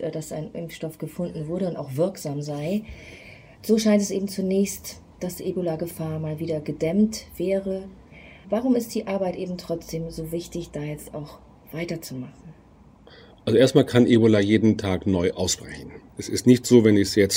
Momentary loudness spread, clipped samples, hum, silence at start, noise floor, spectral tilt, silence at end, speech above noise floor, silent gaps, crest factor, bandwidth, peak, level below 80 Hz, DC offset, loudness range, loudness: 19 LU; under 0.1%; none; 0 s; -51 dBFS; -5.5 dB/octave; 0 s; 28 dB; none; 20 dB; 16 kHz; -2 dBFS; -52 dBFS; under 0.1%; 11 LU; -24 LUFS